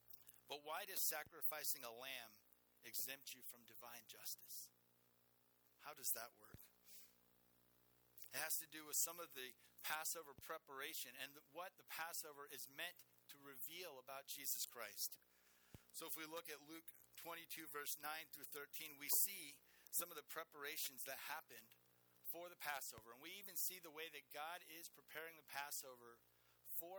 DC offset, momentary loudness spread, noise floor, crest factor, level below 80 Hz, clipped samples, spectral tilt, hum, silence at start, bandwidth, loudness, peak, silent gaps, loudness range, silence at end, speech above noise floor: under 0.1%; 19 LU; -78 dBFS; 28 dB; -90 dBFS; under 0.1%; 0 dB/octave; none; 0.1 s; over 20 kHz; -48 LUFS; -24 dBFS; none; 7 LU; 0 s; 27 dB